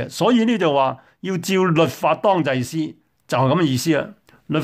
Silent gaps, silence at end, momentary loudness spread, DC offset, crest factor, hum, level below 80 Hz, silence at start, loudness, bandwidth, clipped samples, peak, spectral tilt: none; 0 s; 10 LU; under 0.1%; 14 dB; none; -60 dBFS; 0 s; -19 LUFS; 16 kHz; under 0.1%; -4 dBFS; -6 dB/octave